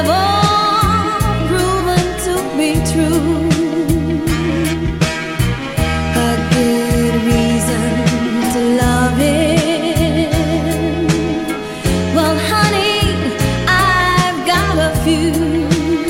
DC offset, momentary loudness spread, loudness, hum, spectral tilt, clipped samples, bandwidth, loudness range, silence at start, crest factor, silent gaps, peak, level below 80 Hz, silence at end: under 0.1%; 5 LU; -15 LUFS; none; -5 dB/octave; under 0.1%; 16.5 kHz; 2 LU; 0 s; 14 dB; none; 0 dBFS; -26 dBFS; 0 s